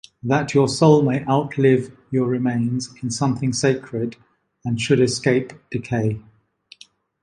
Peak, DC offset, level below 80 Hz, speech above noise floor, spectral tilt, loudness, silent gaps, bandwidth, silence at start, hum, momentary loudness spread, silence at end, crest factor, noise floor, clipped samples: -2 dBFS; under 0.1%; -56 dBFS; 33 dB; -6 dB/octave; -20 LUFS; none; 11.5 kHz; 0.25 s; none; 12 LU; 1.05 s; 18 dB; -52 dBFS; under 0.1%